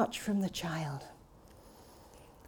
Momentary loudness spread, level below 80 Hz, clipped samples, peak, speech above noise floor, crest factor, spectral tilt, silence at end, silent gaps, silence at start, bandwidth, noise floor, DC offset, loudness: 24 LU; -62 dBFS; under 0.1%; -18 dBFS; 22 dB; 20 dB; -5 dB/octave; 0 s; none; 0 s; 19.5 kHz; -58 dBFS; under 0.1%; -36 LUFS